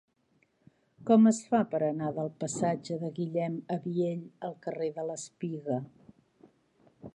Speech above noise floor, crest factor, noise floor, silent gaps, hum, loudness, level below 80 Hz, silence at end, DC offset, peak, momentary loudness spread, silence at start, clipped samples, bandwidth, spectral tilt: 42 dB; 22 dB; -71 dBFS; none; none; -31 LUFS; -76 dBFS; 0.05 s; under 0.1%; -10 dBFS; 14 LU; 1 s; under 0.1%; 11 kHz; -6.5 dB/octave